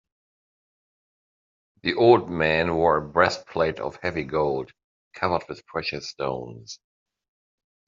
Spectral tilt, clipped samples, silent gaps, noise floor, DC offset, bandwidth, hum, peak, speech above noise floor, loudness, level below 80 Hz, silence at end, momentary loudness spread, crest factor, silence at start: -4 dB/octave; under 0.1%; 4.84-5.11 s; under -90 dBFS; under 0.1%; 7.4 kHz; none; -2 dBFS; over 66 dB; -24 LUFS; -56 dBFS; 1.15 s; 16 LU; 24 dB; 1.85 s